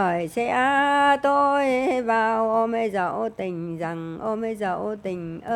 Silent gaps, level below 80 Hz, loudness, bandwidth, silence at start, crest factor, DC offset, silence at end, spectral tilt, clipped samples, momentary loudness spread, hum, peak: none; -60 dBFS; -23 LUFS; 13.5 kHz; 0 s; 16 dB; under 0.1%; 0 s; -5.5 dB/octave; under 0.1%; 11 LU; none; -8 dBFS